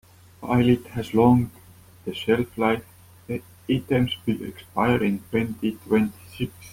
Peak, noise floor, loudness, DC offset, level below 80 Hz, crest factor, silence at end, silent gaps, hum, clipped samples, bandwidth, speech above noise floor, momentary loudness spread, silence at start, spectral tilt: -6 dBFS; -49 dBFS; -24 LUFS; under 0.1%; -52 dBFS; 18 dB; 0 s; none; none; under 0.1%; 16.5 kHz; 26 dB; 13 LU; 0.4 s; -7 dB/octave